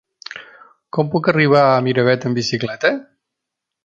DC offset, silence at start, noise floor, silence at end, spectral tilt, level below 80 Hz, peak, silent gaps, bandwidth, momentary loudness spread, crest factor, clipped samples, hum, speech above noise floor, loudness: under 0.1%; 0.35 s; -81 dBFS; 0.8 s; -6 dB/octave; -60 dBFS; -2 dBFS; none; 7.8 kHz; 20 LU; 18 dB; under 0.1%; none; 65 dB; -16 LUFS